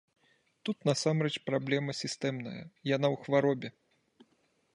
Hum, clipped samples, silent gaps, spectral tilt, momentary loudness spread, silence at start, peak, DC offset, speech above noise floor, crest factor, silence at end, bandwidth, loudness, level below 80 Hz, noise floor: none; under 0.1%; none; -5.5 dB/octave; 11 LU; 0.65 s; -14 dBFS; under 0.1%; 41 dB; 20 dB; 1.05 s; 11.5 kHz; -32 LUFS; -76 dBFS; -73 dBFS